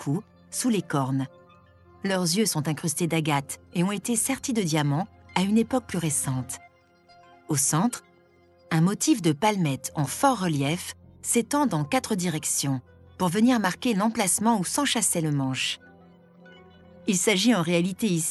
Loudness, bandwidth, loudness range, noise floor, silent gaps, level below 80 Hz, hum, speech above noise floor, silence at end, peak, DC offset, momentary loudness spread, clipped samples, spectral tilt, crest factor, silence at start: -25 LUFS; 12.5 kHz; 3 LU; -58 dBFS; none; -64 dBFS; none; 34 dB; 0 s; -6 dBFS; under 0.1%; 9 LU; under 0.1%; -4 dB/octave; 20 dB; 0 s